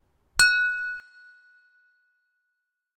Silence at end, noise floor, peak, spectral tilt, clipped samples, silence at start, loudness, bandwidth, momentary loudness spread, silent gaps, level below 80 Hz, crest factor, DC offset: 1.95 s; -80 dBFS; -4 dBFS; 2 dB/octave; under 0.1%; 0.35 s; -22 LUFS; 16 kHz; 15 LU; none; -56 dBFS; 24 dB; under 0.1%